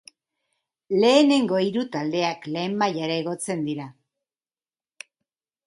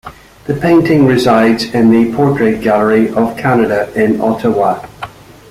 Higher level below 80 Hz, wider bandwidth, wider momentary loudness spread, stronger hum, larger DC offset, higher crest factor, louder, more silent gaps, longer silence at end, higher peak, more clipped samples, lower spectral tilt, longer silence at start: second, -74 dBFS vs -44 dBFS; second, 11.5 kHz vs 15 kHz; about the same, 12 LU vs 12 LU; neither; neither; first, 20 dB vs 10 dB; second, -23 LUFS vs -11 LUFS; neither; first, 1.75 s vs 0.4 s; second, -4 dBFS vs 0 dBFS; neither; second, -5 dB/octave vs -7 dB/octave; first, 0.9 s vs 0.05 s